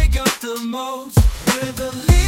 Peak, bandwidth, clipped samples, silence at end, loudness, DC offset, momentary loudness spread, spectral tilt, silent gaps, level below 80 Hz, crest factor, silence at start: 0 dBFS; 17 kHz; under 0.1%; 0 s; -20 LUFS; under 0.1%; 8 LU; -5 dB/octave; none; -20 dBFS; 16 dB; 0 s